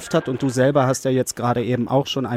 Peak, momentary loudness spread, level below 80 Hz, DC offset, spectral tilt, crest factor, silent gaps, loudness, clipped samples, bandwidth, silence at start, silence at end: -6 dBFS; 5 LU; -56 dBFS; under 0.1%; -5.5 dB/octave; 14 dB; none; -20 LUFS; under 0.1%; 15.5 kHz; 0 s; 0 s